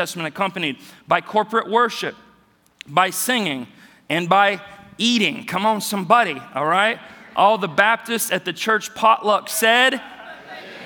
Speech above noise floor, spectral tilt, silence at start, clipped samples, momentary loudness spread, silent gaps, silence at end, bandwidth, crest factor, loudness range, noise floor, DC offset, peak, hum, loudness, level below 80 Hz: 37 dB; -3 dB/octave; 0 s; under 0.1%; 14 LU; none; 0 s; 19.5 kHz; 20 dB; 4 LU; -57 dBFS; under 0.1%; 0 dBFS; none; -19 LUFS; -70 dBFS